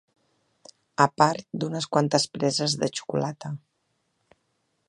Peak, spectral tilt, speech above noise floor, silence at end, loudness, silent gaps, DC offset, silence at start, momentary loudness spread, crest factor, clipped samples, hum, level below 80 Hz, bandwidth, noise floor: -2 dBFS; -4.5 dB/octave; 49 dB; 1.3 s; -25 LUFS; none; under 0.1%; 1 s; 16 LU; 26 dB; under 0.1%; none; -68 dBFS; 11.5 kHz; -74 dBFS